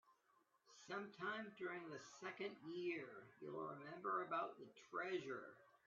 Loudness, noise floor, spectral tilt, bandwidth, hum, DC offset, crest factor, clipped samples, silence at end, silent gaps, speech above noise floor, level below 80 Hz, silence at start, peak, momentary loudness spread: -50 LUFS; -80 dBFS; -3 dB/octave; 7.4 kHz; none; under 0.1%; 18 dB; under 0.1%; 0.1 s; none; 30 dB; under -90 dBFS; 0.05 s; -32 dBFS; 12 LU